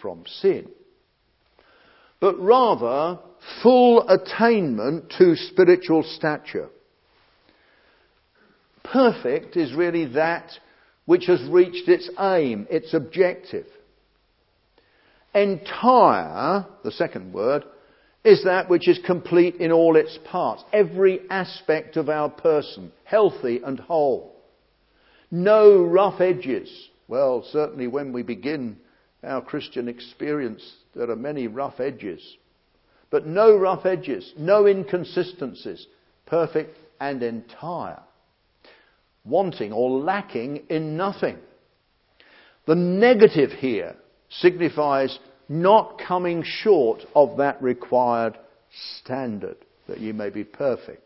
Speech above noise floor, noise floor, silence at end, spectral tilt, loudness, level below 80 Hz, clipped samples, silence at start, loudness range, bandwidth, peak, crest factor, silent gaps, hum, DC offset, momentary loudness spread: 45 dB; -66 dBFS; 0.1 s; -10.5 dB/octave; -21 LUFS; -68 dBFS; under 0.1%; 0.05 s; 10 LU; 5.8 kHz; 0 dBFS; 22 dB; none; none; under 0.1%; 16 LU